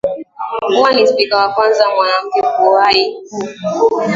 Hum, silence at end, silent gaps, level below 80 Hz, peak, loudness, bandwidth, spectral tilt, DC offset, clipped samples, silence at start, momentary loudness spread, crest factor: none; 0 s; none; -56 dBFS; 0 dBFS; -13 LUFS; 7.6 kHz; -4 dB/octave; under 0.1%; under 0.1%; 0.05 s; 12 LU; 14 dB